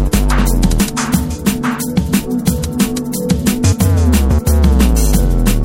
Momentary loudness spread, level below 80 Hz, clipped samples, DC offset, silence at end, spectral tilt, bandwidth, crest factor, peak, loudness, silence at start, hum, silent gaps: 5 LU; -16 dBFS; under 0.1%; under 0.1%; 0 s; -5.5 dB/octave; 17 kHz; 12 dB; 0 dBFS; -14 LUFS; 0 s; none; none